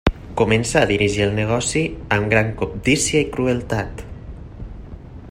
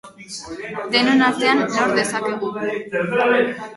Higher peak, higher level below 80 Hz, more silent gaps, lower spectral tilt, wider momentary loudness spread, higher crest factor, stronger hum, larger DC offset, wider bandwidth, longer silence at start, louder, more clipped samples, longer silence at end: about the same, -2 dBFS vs -2 dBFS; first, -34 dBFS vs -60 dBFS; neither; about the same, -4.5 dB/octave vs -4 dB/octave; first, 20 LU vs 14 LU; about the same, 18 dB vs 18 dB; neither; neither; first, 15.5 kHz vs 11.5 kHz; about the same, 0.05 s vs 0.05 s; about the same, -19 LUFS vs -19 LUFS; neither; about the same, 0 s vs 0 s